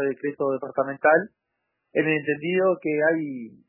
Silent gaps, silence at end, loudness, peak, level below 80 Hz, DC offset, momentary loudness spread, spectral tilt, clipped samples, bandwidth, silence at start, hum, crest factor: none; 0.2 s; -24 LUFS; -6 dBFS; -78 dBFS; under 0.1%; 8 LU; -10 dB/octave; under 0.1%; 3.1 kHz; 0 s; none; 20 dB